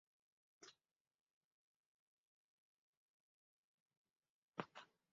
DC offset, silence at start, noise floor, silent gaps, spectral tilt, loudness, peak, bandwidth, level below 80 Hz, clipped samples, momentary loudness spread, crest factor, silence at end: under 0.1%; 0.6 s; -78 dBFS; 1.00-1.05 s, 1.15-1.27 s, 1.33-3.86 s, 3.97-4.05 s, 4.16-4.23 s, 4.30-4.53 s; -3.5 dB/octave; -57 LUFS; -26 dBFS; 7 kHz; under -90 dBFS; under 0.1%; 12 LU; 38 dB; 0.25 s